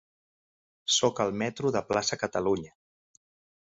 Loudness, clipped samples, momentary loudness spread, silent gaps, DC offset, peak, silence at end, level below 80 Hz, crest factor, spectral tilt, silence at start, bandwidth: -28 LUFS; under 0.1%; 8 LU; none; under 0.1%; -10 dBFS; 0.95 s; -62 dBFS; 20 dB; -3 dB/octave; 0.85 s; 8.2 kHz